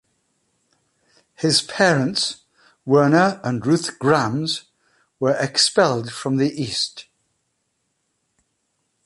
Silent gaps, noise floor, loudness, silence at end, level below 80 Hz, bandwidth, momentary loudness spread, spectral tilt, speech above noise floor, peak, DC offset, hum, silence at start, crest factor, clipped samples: none; -72 dBFS; -19 LUFS; 2.05 s; -62 dBFS; 11.5 kHz; 9 LU; -4 dB/octave; 53 dB; -2 dBFS; under 0.1%; none; 1.4 s; 20 dB; under 0.1%